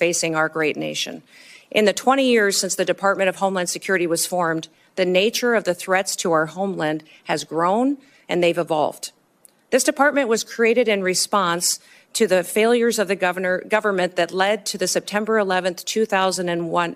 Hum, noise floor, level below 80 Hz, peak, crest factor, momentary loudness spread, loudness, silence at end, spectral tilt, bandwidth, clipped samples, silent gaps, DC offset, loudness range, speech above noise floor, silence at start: none; -56 dBFS; -70 dBFS; -2 dBFS; 18 dB; 8 LU; -20 LUFS; 0 s; -3 dB/octave; 15.5 kHz; under 0.1%; none; under 0.1%; 3 LU; 35 dB; 0 s